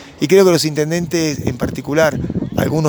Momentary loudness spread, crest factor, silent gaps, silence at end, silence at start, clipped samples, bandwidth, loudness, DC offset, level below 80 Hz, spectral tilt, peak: 10 LU; 16 dB; none; 0 s; 0 s; under 0.1%; over 20 kHz; -16 LUFS; under 0.1%; -40 dBFS; -5.5 dB/octave; 0 dBFS